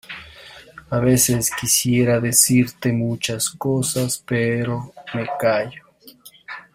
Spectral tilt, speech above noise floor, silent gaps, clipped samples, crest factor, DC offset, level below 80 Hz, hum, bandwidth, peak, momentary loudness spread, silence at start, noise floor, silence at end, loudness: -4 dB/octave; 27 dB; none; under 0.1%; 20 dB; under 0.1%; -50 dBFS; none; 16 kHz; 0 dBFS; 18 LU; 0.1 s; -47 dBFS; 0.15 s; -19 LUFS